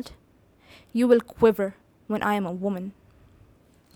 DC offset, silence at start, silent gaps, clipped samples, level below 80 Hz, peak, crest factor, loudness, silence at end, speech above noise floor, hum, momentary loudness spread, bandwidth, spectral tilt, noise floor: under 0.1%; 0 s; none; under 0.1%; -58 dBFS; -6 dBFS; 20 dB; -24 LUFS; 1.05 s; 36 dB; none; 13 LU; 19 kHz; -7 dB/octave; -59 dBFS